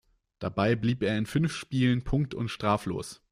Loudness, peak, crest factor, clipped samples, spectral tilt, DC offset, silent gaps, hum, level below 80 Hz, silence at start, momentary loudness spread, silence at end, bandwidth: -29 LUFS; -12 dBFS; 16 dB; under 0.1%; -6.5 dB/octave; under 0.1%; none; none; -48 dBFS; 0.4 s; 8 LU; 0.15 s; 14.5 kHz